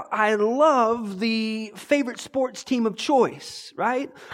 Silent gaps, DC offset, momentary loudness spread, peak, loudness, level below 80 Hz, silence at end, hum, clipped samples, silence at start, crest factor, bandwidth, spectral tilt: none; under 0.1%; 10 LU; -6 dBFS; -23 LUFS; -68 dBFS; 0 s; none; under 0.1%; 0 s; 16 dB; 15.5 kHz; -4.5 dB/octave